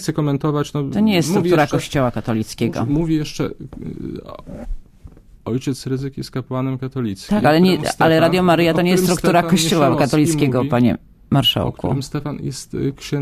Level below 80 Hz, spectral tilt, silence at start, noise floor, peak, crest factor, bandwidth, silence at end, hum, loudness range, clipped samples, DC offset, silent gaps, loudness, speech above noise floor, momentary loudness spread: -40 dBFS; -5.5 dB/octave; 0 s; -42 dBFS; 0 dBFS; 18 dB; 15.5 kHz; 0 s; none; 11 LU; under 0.1%; under 0.1%; none; -18 LUFS; 25 dB; 15 LU